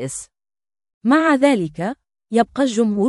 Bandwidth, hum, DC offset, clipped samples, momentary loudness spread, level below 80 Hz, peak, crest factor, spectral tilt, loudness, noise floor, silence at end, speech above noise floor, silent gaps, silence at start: 12 kHz; none; under 0.1%; under 0.1%; 14 LU; -58 dBFS; -2 dBFS; 18 dB; -5 dB/octave; -18 LUFS; under -90 dBFS; 0 s; over 73 dB; 0.94-1.01 s; 0 s